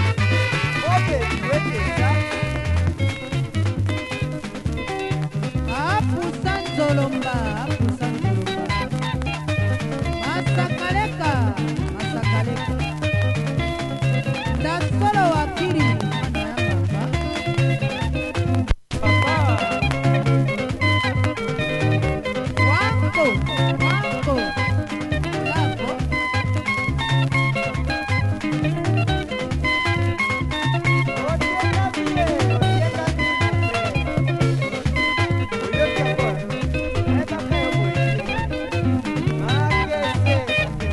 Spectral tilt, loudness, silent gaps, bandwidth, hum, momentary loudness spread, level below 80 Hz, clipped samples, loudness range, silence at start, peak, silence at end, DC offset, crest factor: -6 dB/octave; -21 LUFS; none; 11.5 kHz; none; 5 LU; -34 dBFS; under 0.1%; 3 LU; 0 s; -2 dBFS; 0 s; under 0.1%; 18 dB